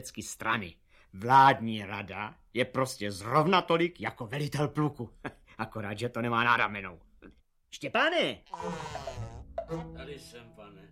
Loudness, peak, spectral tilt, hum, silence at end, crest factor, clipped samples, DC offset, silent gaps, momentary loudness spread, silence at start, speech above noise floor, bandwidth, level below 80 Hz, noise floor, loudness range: -29 LUFS; -10 dBFS; -5 dB/octave; none; 0.05 s; 22 dB; under 0.1%; under 0.1%; none; 19 LU; 0 s; 27 dB; 16 kHz; -58 dBFS; -57 dBFS; 7 LU